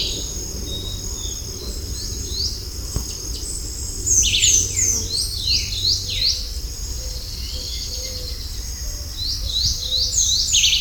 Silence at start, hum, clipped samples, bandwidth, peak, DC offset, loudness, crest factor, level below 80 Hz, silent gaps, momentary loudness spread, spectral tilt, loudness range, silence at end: 0 s; none; under 0.1%; 19 kHz; -4 dBFS; under 0.1%; -20 LUFS; 20 dB; -30 dBFS; none; 14 LU; -0.5 dB/octave; 9 LU; 0 s